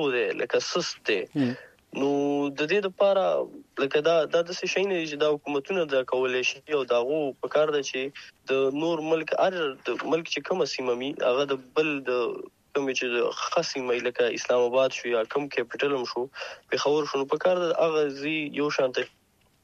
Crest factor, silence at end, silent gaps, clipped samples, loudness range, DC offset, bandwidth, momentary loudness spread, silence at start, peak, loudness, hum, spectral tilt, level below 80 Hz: 16 dB; 0.55 s; none; under 0.1%; 2 LU; under 0.1%; 8.2 kHz; 7 LU; 0 s; -10 dBFS; -26 LUFS; none; -4 dB/octave; -74 dBFS